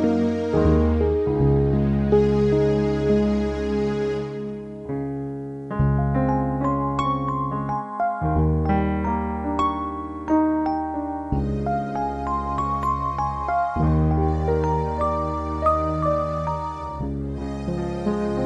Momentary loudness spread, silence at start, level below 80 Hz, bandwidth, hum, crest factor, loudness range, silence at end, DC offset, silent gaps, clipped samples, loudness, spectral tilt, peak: 10 LU; 0 s; -34 dBFS; 8.6 kHz; none; 16 dB; 4 LU; 0 s; under 0.1%; none; under 0.1%; -23 LUFS; -9 dB/octave; -6 dBFS